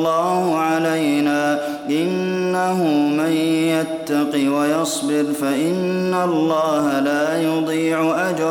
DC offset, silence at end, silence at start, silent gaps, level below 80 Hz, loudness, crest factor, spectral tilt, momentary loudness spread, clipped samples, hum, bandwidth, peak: under 0.1%; 0 s; 0 s; none; -64 dBFS; -19 LUFS; 12 dB; -5 dB/octave; 3 LU; under 0.1%; none; 17 kHz; -6 dBFS